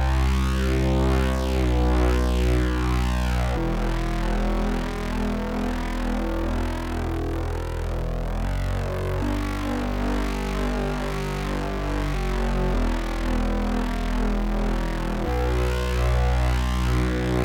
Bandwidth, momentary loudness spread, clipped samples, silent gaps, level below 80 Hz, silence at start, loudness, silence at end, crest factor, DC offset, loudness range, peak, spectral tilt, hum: 16.5 kHz; 5 LU; under 0.1%; none; -26 dBFS; 0 s; -25 LUFS; 0 s; 12 dB; under 0.1%; 5 LU; -10 dBFS; -6.5 dB/octave; none